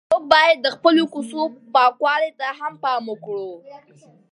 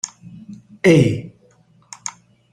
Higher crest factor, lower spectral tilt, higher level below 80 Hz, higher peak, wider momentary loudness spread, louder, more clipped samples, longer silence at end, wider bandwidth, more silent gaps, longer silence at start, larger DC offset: about the same, 20 dB vs 18 dB; second, -3.5 dB/octave vs -6 dB/octave; second, -64 dBFS vs -54 dBFS; about the same, 0 dBFS vs -2 dBFS; second, 15 LU vs 27 LU; second, -19 LUFS vs -16 LUFS; neither; about the same, 0.55 s vs 0.45 s; second, 11.5 kHz vs 13 kHz; neither; about the same, 0.1 s vs 0.05 s; neither